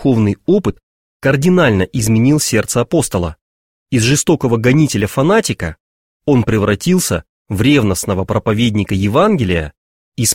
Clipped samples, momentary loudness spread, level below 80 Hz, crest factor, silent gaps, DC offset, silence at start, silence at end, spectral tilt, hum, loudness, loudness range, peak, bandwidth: under 0.1%; 9 LU; -38 dBFS; 14 dB; 0.83-1.20 s, 3.41-3.86 s, 5.80-6.20 s, 7.29-7.45 s, 9.77-10.12 s; 0.2%; 0 s; 0 s; -5 dB/octave; none; -14 LUFS; 1 LU; 0 dBFS; 16.5 kHz